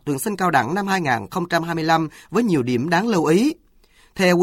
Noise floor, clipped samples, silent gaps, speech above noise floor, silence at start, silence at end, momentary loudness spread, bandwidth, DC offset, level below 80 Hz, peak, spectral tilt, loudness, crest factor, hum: -54 dBFS; under 0.1%; none; 35 dB; 0.05 s; 0 s; 5 LU; 16.5 kHz; under 0.1%; -56 dBFS; -4 dBFS; -5.5 dB/octave; -20 LUFS; 16 dB; none